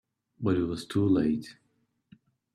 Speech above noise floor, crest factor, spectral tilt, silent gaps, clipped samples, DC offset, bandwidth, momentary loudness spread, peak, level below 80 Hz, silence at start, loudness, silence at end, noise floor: 34 dB; 18 dB; -7.5 dB/octave; none; under 0.1%; under 0.1%; 12.5 kHz; 10 LU; -14 dBFS; -60 dBFS; 0.4 s; -28 LUFS; 1 s; -61 dBFS